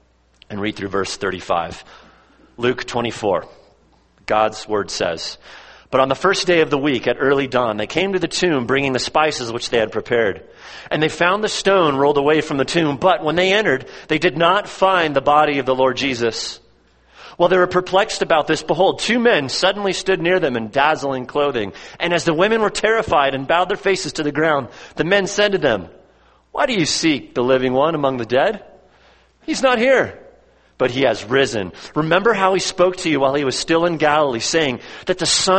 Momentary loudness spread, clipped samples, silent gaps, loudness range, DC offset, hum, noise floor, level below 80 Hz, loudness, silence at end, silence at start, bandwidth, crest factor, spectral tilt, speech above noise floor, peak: 9 LU; under 0.1%; none; 5 LU; under 0.1%; none; -55 dBFS; -50 dBFS; -18 LUFS; 0 s; 0.5 s; 8.8 kHz; 18 dB; -4 dB/octave; 37 dB; 0 dBFS